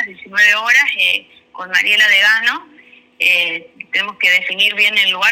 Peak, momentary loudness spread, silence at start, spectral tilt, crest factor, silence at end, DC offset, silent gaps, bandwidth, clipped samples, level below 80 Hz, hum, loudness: 0 dBFS; 10 LU; 0 s; 0.5 dB/octave; 14 dB; 0 s; under 0.1%; none; over 20 kHz; under 0.1%; -68 dBFS; none; -12 LUFS